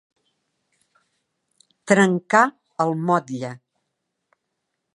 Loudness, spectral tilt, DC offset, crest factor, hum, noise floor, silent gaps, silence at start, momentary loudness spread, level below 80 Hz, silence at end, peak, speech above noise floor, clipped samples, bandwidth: -20 LUFS; -5.5 dB/octave; under 0.1%; 24 dB; none; -78 dBFS; none; 1.85 s; 14 LU; -74 dBFS; 1.4 s; 0 dBFS; 59 dB; under 0.1%; 11.5 kHz